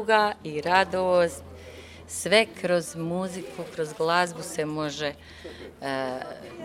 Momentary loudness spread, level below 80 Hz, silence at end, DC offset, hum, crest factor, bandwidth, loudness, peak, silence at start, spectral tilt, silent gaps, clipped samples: 20 LU; -58 dBFS; 0 s; under 0.1%; none; 22 dB; 16 kHz; -26 LUFS; -4 dBFS; 0 s; -4 dB/octave; none; under 0.1%